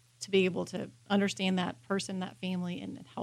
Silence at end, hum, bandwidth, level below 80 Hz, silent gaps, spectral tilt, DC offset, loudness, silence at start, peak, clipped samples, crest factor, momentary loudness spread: 0 s; none; 13 kHz; -72 dBFS; none; -5 dB/octave; under 0.1%; -33 LUFS; 0.2 s; -16 dBFS; under 0.1%; 18 dB; 11 LU